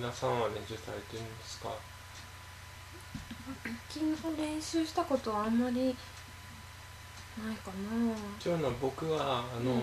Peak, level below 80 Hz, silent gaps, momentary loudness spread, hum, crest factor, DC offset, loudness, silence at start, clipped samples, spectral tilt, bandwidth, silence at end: -18 dBFS; -58 dBFS; none; 16 LU; none; 18 dB; under 0.1%; -36 LUFS; 0 s; under 0.1%; -5.5 dB/octave; 14 kHz; 0 s